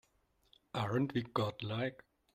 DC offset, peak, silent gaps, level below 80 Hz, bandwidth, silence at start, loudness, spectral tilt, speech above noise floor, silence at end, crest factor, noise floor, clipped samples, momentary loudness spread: under 0.1%; -18 dBFS; none; -70 dBFS; 15 kHz; 0.75 s; -38 LUFS; -7 dB/octave; 38 dB; 0.4 s; 20 dB; -75 dBFS; under 0.1%; 6 LU